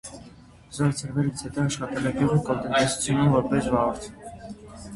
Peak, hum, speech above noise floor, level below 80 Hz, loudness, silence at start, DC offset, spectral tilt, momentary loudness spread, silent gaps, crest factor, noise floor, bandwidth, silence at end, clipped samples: -6 dBFS; none; 25 dB; -48 dBFS; -24 LUFS; 0.05 s; under 0.1%; -5.5 dB/octave; 20 LU; none; 18 dB; -49 dBFS; 11.5 kHz; 0 s; under 0.1%